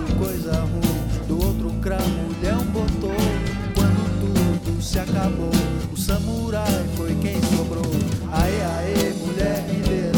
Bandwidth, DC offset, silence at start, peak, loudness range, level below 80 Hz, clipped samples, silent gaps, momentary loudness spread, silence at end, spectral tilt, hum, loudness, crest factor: 19 kHz; under 0.1%; 0 s; -8 dBFS; 1 LU; -30 dBFS; under 0.1%; none; 3 LU; 0 s; -6 dB/octave; none; -22 LUFS; 14 dB